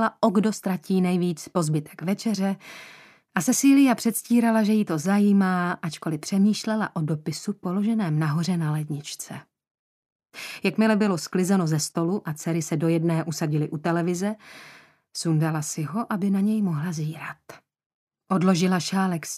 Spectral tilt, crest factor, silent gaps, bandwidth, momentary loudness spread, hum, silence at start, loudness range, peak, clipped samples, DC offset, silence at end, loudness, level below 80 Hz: -5.5 dB/octave; 18 dB; 9.71-10.19 s, 17.86-18.07 s; 15 kHz; 12 LU; none; 0 s; 6 LU; -6 dBFS; under 0.1%; under 0.1%; 0 s; -24 LUFS; -72 dBFS